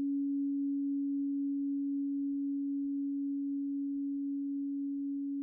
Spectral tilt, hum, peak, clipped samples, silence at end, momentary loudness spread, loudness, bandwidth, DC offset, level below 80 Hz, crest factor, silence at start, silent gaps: 2 dB/octave; none; -30 dBFS; under 0.1%; 0 s; 3 LU; -35 LUFS; 0.5 kHz; under 0.1%; -82 dBFS; 6 dB; 0 s; none